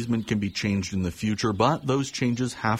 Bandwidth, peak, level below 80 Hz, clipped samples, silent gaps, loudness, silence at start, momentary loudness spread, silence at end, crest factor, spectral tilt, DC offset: 14.5 kHz; -8 dBFS; -54 dBFS; under 0.1%; none; -26 LUFS; 0 s; 5 LU; 0 s; 18 dB; -5.5 dB/octave; under 0.1%